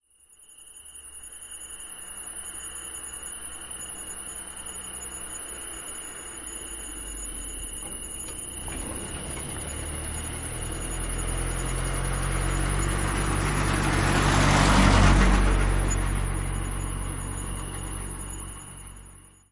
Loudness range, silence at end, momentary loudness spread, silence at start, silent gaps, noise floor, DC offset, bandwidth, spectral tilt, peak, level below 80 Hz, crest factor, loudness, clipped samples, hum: 12 LU; 0.2 s; 16 LU; 0.4 s; none; -55 dBFS; under 0.1%; 11.5 kHz; -4 dB/octave; -6 dBFS; -32 dBFS; 22 dB; -28 LUFS; under 0.1%; none